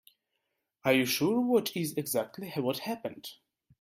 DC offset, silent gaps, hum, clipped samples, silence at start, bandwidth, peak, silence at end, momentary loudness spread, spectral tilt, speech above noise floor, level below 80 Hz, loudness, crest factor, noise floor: under 0.1%; none; none; under 0.1%; 0.85 s; 16.5 kHz; -12 dBFS; 0.45 s; 13 LU; -4.5 dB/octave; 52 dB; -74 dBFS; -30 LUFS; 20 dB; -82 dBFS